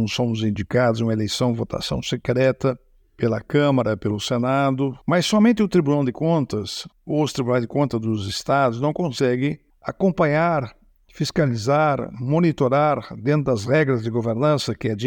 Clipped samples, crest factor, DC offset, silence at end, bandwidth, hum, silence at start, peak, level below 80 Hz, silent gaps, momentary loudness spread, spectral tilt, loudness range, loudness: under 0.1%; 16 dB; under 0.1%; 0 s; 18.5 kHz; none; 0 s; -4 dBFS; -50 dBFS; none; 7 LU; -6.5 dB/octave; 2 LU; -21 LUFS